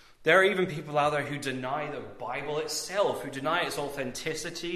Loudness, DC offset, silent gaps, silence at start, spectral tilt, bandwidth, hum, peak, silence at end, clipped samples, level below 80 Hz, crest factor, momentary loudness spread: -29 LUFS; under 0.1%; none; 0.2 s; -3.5 dB/octave; 14 kHz; none; -8 dBFS; 0 s; under 0.1%; -62 dBFS; 20 dB; 12 LU